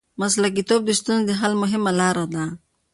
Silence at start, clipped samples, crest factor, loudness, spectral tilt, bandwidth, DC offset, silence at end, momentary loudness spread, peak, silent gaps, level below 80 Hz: 0.2 s; under 0.1%; 14 dB; -21 LUFS; -4 dB/octave; 11.5 kHz; under 0.1%; 0.35 s; 8 LU; -6 dBFS; none; -60 dBFS